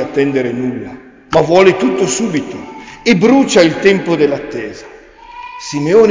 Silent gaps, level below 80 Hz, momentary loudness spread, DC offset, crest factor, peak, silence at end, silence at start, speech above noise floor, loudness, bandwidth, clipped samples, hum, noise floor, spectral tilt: none; -46 dBFS; 19 LU; under 0.1%; 12 dB; 0 dBFS; 0 s; 0 s; 23 dB; -12 LUFS; 7.6 kHz; under 0.1%; none; -35 dBFS; -5 dB/octave